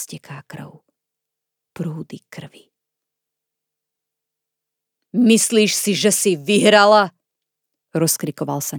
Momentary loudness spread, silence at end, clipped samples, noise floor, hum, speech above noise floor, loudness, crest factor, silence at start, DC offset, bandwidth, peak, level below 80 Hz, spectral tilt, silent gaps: 24 LU; 0 s; under 0.1%; -82 dBFS; none; 65 dB; -16 LUFS; 20 dB; 0 s; under 0.1%; over 20 kHz; 0 dBFS; -76 dBFS; -3.5 dB/octave; none